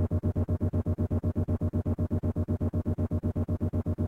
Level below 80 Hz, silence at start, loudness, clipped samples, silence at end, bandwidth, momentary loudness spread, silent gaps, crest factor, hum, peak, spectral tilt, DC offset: -40 dBFS; 0 s; -30 LUFS; under 0.1%; 0 s; 2.6 kHz; 1 LU; none; 12 dB; none; -16 dBFS; -11 dB/octave; under 0.1%